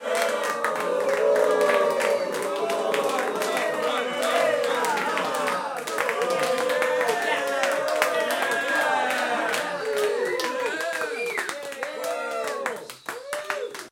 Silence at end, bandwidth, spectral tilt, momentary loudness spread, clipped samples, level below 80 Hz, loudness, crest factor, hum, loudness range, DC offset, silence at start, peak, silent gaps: 0 s; 17 kHz; -2 dB/octave; 8 LU; under 0.1%; -74 dBFS; -25 LUFS; 22 dB; none; 4 LU; under 0.1%; 0 s; -2 dBFS; none